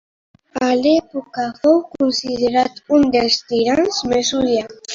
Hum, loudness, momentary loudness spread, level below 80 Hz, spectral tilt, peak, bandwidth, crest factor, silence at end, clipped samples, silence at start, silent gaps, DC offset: none; -17 LUFS; 7 LU; -50 dBFS; -3.5 dB/octave; -2 dBFS; 7.6 kHz; 16 dB; 0 s; under 0.1%; 0.55 s; none; under 0.1%